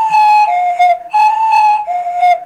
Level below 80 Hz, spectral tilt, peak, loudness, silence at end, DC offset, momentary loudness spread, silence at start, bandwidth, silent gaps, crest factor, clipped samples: -58 dBFS; -1 dB/octave; -6 dBFS; -11 LUFS; 0 s; under 0.1%; 4 LU; 0 s; 12 kHz; none; 6 dB; under 0.1%